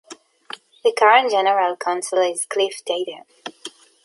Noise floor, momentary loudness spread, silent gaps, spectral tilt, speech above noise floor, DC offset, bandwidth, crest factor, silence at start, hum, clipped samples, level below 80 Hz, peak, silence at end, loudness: -41 dBFS; 23 LU; none; -1 dB/octave; 22 dB; under 0.1%; 11.5 kHz; 20 dB; 0.1 s; none; under 0.1%; -82 dBFS; -2 dBFS; 0.35 s; -19 LUFS